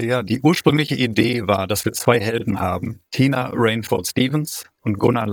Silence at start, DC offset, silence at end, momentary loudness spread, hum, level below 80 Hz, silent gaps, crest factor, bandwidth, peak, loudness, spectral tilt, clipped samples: 0 s; under 0.1%; 0 s; 7 LU; none; -52 dBFS; none; 18 dB; over 20 kHz; -2 dBFS; -20 LUFS; -5.5 dB/octave; under 0.1%